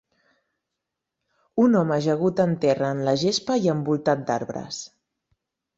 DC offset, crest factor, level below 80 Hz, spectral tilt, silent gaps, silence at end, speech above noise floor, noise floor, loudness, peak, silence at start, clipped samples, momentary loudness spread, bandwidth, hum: under 0.1%; 18 dB; -64 dBFS; -6 dB/octave; none; 0.9 s; 61 dB; -83 dBFS; -23 LUFS; -6 dBFS; 1.55 s; under 0.1%; 12 LU; 8 kHz; none